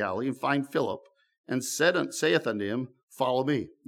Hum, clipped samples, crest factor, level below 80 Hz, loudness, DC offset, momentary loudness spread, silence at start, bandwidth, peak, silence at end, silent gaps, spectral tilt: none; under 0.1%; 20 dB; -76 dBFS; -28 LUFS; under 0.1%; 9 LU; 0 s; 17 kHz; -8 dBFS; 0.2 s; 1.38-1.44 s, 3.03-3.08 s; -4 dB/octave